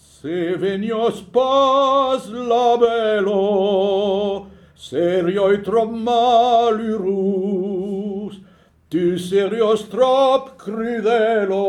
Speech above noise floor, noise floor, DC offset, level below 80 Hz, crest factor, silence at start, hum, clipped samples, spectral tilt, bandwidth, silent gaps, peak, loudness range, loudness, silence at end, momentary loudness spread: 33 dB; -50 dBFS; under 0.1%; -56 dBFS; 14 dB; 0.25 s; none; under 0.1%; -6 dB/octave; 12.5 kHz; none; -4 dBFS; 3 LU; -18 LUFS; 0 s; 10 LU